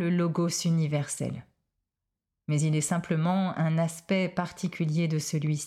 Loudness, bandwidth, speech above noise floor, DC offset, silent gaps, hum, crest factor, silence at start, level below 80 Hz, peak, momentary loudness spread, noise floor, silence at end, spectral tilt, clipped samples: -28 LUFS; 14.5 kHz; 59 dB; under 0.1%; none; none; 12 dB; 0 s; -68 dBFS; -16 dBFS; 7 LU; -87 dBFS; 0 s; -5.5 dB/octave; under 0.1%